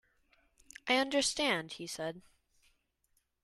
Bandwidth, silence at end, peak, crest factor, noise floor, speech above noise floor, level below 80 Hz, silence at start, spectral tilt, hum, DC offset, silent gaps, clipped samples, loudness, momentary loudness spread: 13 kHz; 1.25 s; -16 dBFS; 22 dB; -78 dBFS; 44 dB; -70 dBFS; 0.85 s; -2 dB/octave; none; under 0.1%; none; under 0.1%; -33 LUFS; 14 LU